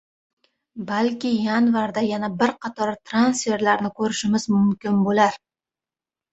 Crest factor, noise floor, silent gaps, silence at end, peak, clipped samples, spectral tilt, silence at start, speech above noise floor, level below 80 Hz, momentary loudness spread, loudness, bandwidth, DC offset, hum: 20 dB; under -90 dBFS; none; 0.95 s; -2 dBFS; under 0.1%; -5 dB/octave; 0.75 s; over 69 dB; -62 dBFS; 7 LU; -21 LUFS; 8.2 kHz; under 0.1%; none